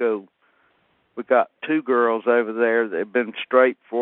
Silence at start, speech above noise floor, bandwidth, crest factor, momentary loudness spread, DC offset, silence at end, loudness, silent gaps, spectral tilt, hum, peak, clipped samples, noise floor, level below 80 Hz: 0 s; 44 dB; 4 kHz; 20 dB; 7 LU; under 0.1%; 0 s; -21 LUFS; none; -2.5 dB/octave; none; -2 dBFS; under 0.1%; -64 dBFS; -78 dBFS